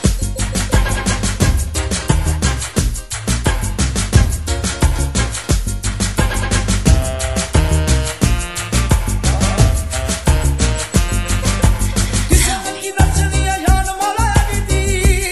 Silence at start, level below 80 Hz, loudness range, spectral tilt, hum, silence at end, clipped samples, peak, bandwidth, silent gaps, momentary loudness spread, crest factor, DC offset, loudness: 0 s; -18 dBFS; 2 LU; -4.5 dB/octave; none; 0 s; under 0.1%; 0 dBFS; 13 kHz; none; 5 LU; 16 dB; 0.4%; -17 LUFS